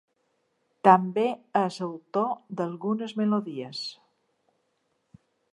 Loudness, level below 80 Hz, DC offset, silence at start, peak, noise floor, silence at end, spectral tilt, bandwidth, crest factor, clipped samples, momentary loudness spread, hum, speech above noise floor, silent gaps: -26 LUFS; -78 dBFS; under 0.1%; 0.85 s; -2 dBFS; -74 dBFS; 1.6 s; -6.5 dB/octave; 11 kHz; 26 dB; under 0.1%; 15 LU; none; 48 dB; none